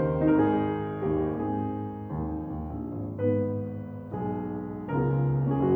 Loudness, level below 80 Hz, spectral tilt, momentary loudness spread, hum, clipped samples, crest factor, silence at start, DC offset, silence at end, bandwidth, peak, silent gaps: -29 LUFS; -46 dBFS; -12 dB/octave; 11 LU; none; under 0.1%; 16 dB; 0 s; under 0.1%; 0 s; 3.5 kHz; -12 dBFS; none